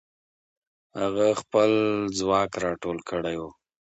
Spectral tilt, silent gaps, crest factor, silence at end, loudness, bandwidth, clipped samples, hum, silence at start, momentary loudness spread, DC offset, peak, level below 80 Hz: -5 dB/octave; none; 18 dB; 0.35 s; -25 LUFS; 8.2 kHz; under 0.1%; none; 0.95 s; 11 LU; under 0.1%; -8 dBFS; -58 dBFS